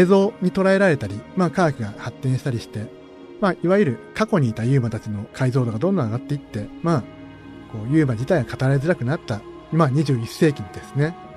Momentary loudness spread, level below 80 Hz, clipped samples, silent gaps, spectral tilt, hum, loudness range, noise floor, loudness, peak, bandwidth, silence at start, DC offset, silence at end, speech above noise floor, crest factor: 14 LU; -52 dBFS; under 0.1%; none; -7.5 dB/octave; none; 2 LU; -40 dBFS; -21 LUFS; -4 dBFS; 13.5 kHz; 0 s; under 0.1%; 0 s; 19 dB; 16 dB